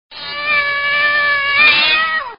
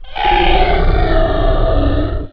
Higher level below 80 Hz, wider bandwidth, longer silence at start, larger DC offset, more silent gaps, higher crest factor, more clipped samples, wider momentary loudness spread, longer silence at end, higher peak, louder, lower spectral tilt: second, -50 dBFS vs -14 dBFS; about the same, 5.4 kHz vs 5.2 kHz; about the same, 0.1 s vs 0 s; second, 0.2% vs 1%; neither; about the same, 14 dB vs 12 dB; neither; first, 8 LU vs 4 LU; about the same, 0.05 s vs 0 s; about the same, 0 dBFS vs 0 dBFS; first, -12 LUFS vs -15 LUFS; second, 3 dB/octave vs -8.5 dB/octave